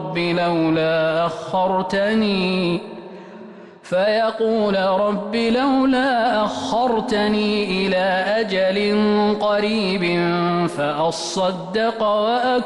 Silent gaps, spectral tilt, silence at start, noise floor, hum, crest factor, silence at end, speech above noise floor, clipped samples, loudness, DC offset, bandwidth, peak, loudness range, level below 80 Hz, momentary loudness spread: none; -5.5 dB/octave; 0 s; -39 dBFS; none; 8 dB; 0 s; 21 dB; under 0.1%; -19 LUFS; under 0.1%; 11.5 kHz; -10 dBFS; 2 LU; -52 dBFS; 4 LU